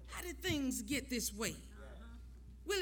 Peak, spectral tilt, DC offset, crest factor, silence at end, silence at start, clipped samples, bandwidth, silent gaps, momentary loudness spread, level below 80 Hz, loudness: -22 dBFS; -3 dB/octave; under 0.1%; 20 dB; 0 s; 0 s; under 0.1%; over 20 kHz; none; 17 LU; -54 dBFS; -39 LUFS